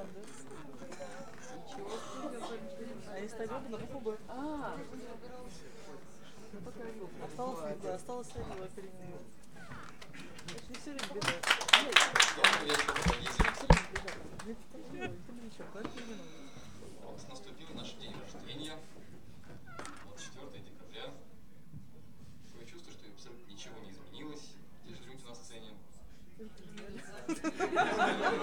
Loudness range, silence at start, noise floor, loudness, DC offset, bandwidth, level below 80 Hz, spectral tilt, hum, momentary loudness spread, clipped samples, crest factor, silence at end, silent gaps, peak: 23 LU; 0 s; -59 dBFS; -33 LUFS; 0.5%; 18 kHz; -48 dBFS; -3 dB/octave; none; 24 LU; under 0.1%; 32 dB; 0 s; none; -4 dBFS